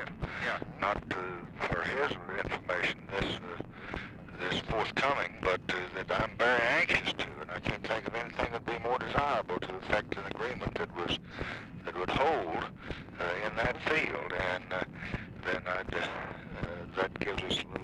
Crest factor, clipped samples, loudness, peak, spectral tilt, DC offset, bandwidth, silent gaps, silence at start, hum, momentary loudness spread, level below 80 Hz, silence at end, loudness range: 22 dB; under 0.1%; -34 LUFS; -12 dBFS; -5 dB/octave; under 0.1%; 12.5 kHz; none; 0 s; none; 11 LU; -52 dBFS; 0 s; 5 LU